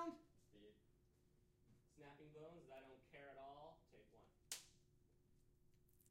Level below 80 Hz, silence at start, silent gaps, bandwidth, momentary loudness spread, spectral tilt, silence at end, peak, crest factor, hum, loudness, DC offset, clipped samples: -80 dBFS; 0 s; none; 15.5 kHz; 12 LU; -3 dB/octave; 0 s; -32 dBFS; 30 dB; none; -60 LUFS; under 0.1%; under 0.1%